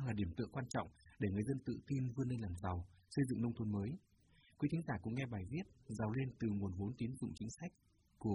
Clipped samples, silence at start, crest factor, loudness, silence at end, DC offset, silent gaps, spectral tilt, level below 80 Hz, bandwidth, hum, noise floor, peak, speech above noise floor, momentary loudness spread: under 0.1%; 0 s; 16 dB; -43 LUFS; 0 s; under 0.1%; none; -7.5 dB/octave; -66 dBFS; 11.5 kHz; none; -70 dBFS; -26 dBFS; 28 dB; 8 LU